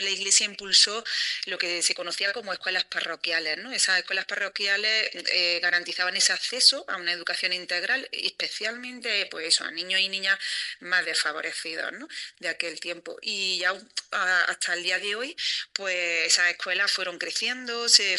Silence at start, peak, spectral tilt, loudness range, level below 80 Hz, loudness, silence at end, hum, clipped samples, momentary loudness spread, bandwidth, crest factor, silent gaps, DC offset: 0 s; -2 dBFS; 1.5 dB/octave; 5 LU; -78 dBFS; -24 LUFS; 0 s; none; under 0.1%; 11 LU; 13 kHz; 26 dB; none; under 0.1%